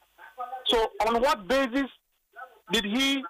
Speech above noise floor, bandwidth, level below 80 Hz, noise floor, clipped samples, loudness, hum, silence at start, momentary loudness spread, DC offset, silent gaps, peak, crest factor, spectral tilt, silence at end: 23 dB; 15.5 kHz; -52 dBFS; -48 dBFS; under 0.1%; -26 LUFS; none; 0.2 s; 19 LU; under 0.1%; none; -14 dBFS; 14 dB; -3 dB/octave; 0 s